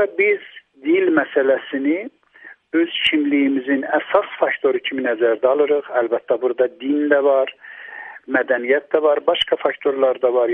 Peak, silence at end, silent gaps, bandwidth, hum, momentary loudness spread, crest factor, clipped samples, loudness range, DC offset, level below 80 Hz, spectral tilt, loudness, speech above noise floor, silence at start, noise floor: -2 dBFS; 0 s; none; 9.2 kHz; none; 7 LU; 16 dB; under 0.1%; 1 LU; under 0.1%; -66 dBFS; -5.5 dB/octave; -19 LUFS; 27 dB; 0 s; -45 dBFS